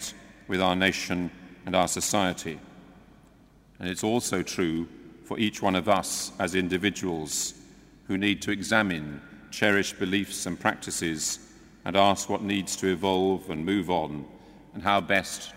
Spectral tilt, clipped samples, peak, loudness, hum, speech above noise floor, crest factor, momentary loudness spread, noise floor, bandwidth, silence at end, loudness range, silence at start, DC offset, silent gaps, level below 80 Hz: -3.5 dB/octave; under 0.1%; -6 dBFS; -27 LUFS; none; 29 dB; 22 dB; 14 LU; -56 dBFS; 16 kHz; 0 s; 3 LU; 0 s; under 0.1%; none; -58 dBFS